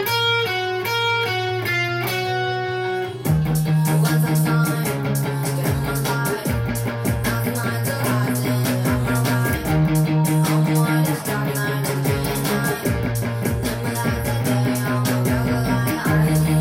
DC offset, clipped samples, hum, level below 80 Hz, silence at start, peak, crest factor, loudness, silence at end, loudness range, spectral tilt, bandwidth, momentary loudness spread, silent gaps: under 0.1%; under 0.1%; none; -40 dBFS; 0 s; -6 dBFS; 14 dB; -21 LUFS; 0 s; 3 LU; -5.5 dB/octave; 17 kHz; 5 LU; none